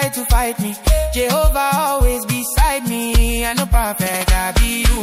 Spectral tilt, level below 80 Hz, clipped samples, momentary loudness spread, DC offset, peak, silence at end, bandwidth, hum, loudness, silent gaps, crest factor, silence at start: -4 dB/octave; -18 dBFS; under 0.1%; 3 LU; under 0.1%; -2 dBFS; 0 s; 16.5 kHz; none; -17 LUFS; none; 14 dB; 0 s